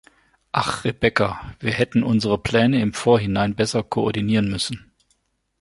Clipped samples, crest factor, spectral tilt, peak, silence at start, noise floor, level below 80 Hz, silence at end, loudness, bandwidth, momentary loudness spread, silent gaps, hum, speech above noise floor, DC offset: under 0.1%; 20 dB; -5.5 dB/octave; -2 dBFS; 0.55 s; -68 dBFS; -46 dBFS; 0.8 s; -21 LUFS; 11.5 kHz; 7 LU; none; none; 47 dB; under 0.1%